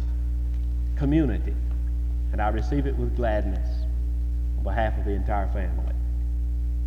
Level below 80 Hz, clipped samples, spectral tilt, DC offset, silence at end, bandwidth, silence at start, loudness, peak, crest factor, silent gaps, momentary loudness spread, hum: -26 dBFS; under 0.1%; -9 dB/octave; under 0.1%; 0 s; 4.8 kHz; 0 s; -27 LUFS; -10 dBFS; 14 dB; none; 5 LU; 60 Hz at -25 dBFS